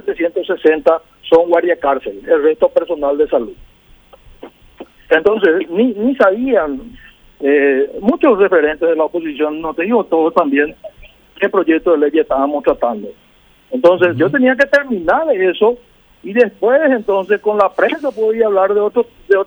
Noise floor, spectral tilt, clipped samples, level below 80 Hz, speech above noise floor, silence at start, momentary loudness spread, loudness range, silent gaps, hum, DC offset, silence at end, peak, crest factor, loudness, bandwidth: -49 dBFS; -7 dB/octave; under 0.1%; -48 dBFS; 35 dB; 0.05 s; 7 LU; 3 LU; none; none; under 0.1%; 0 s; 0 dBFS; 14 dB; -14 LUFS; over 20 kHz